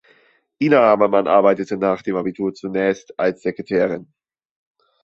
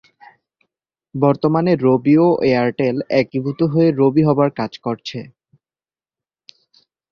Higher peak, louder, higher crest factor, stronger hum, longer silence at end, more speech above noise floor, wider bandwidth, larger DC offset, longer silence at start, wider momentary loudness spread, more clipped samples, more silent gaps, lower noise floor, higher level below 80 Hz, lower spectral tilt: about the same, -2 dBFS vs -2 dBFS; about the same, -18 LUFS vs -17 LUFS; about the same, 18 dB vs 16 dB; neither; second, 1 s vs 1.85 s; second, 39 dB vs over 74 dB; first, 7.8 kHz vs 6.8 kHz; neither; second, 0.6 s vs 1.15 s; about the same, 10 LU vs 12 LU; neither; neither; second, -57 dBFS vs under -90 dBFS; second, -62 dBFS vs -56 dBFS; second, -7 dB/octave vs -9 dB/octave